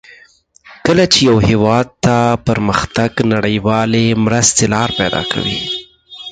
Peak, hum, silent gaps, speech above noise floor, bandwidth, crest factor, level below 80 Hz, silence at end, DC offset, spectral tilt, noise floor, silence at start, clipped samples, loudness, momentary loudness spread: 0 dBFS; none; none; 34 dB; 9.4 kHz; 14 dB; -38 dBFS; 0 s; under 0.1%; -4 dB/octave; -47 dBFS; 0.65 s; under 0.1%; -13 LUFS; 8 LU